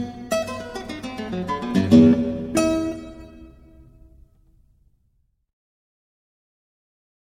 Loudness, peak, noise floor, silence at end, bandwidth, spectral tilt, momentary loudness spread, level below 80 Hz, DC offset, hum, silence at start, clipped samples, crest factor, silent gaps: -21 LUFS; -2 dBFS; -66 dBFS; 3.75 s; 15.5 kHz; -6.5 dB/octave; 19 LU; -48 dBFS; under 0.1%; none; 0 s; under 0.1%; 22 dB; none